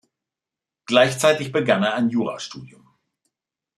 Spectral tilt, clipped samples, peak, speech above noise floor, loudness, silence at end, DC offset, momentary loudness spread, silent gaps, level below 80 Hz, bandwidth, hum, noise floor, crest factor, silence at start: -4.5 dB/octave; under 0.1%; -2 dBFS; 68 dB; -20 LUFS; 1.1 s; under 0.1%; 16 LU; none; -68 dBFS; 13.5 kHz; none; -88 dBFS; 20 dB; 0.9 s